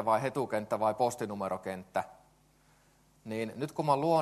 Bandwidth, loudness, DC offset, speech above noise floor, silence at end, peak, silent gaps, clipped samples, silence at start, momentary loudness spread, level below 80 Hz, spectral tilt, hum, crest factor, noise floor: 13 kHz; -33 LUFS; under 0.1%; 34 dB; 0 s; -14 dBFS; none; under 0.1%; 0 s; 9 LU; -72 dBFS; -6 dB/octave; none; 20 dB; -65 dBFS